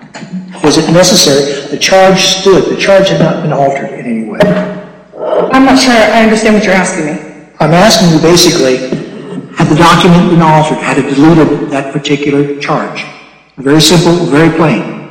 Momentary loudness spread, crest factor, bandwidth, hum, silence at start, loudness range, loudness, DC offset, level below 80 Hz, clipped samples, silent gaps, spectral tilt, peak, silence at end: 13 LU; 8 dB; 17.5 kHz; none; 0 s; 3 LU; -7 LUFS; under 0.1%; -36 dBFS; 0.7%; none; -4.5 dB/octave; 0 dBFS; 0 s